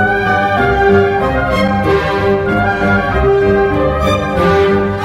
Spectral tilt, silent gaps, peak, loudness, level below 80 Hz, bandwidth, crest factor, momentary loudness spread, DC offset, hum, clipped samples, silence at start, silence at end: -7 dB/octave; none; 0 dBFS; -12 LUFS; -26 dBFS; 13.5 kHz; 12 dB; 3 LU; under 0.1%; none; under 0.1%; 0 s; 0 s